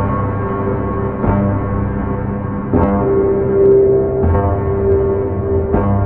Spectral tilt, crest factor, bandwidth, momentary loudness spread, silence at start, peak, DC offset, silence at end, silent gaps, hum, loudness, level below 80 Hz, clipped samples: -13.5 dB/octave; 14 dB; 3.2 kHz; 8 LU; 0 s; 0 dBFS; under 0.1%; 0 s; none; none; -15 LUFS; -26 dBFS; under 0.1%